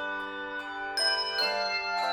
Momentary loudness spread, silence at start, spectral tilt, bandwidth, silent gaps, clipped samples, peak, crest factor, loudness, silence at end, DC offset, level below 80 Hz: 10 LU; 0 s; -0.5 dB/octave; 16.5 kHz; none; under 0.1%; -16 dBFS; 14 dB; -29 LUFS; 0 s; under 0.1%; -66 dBFS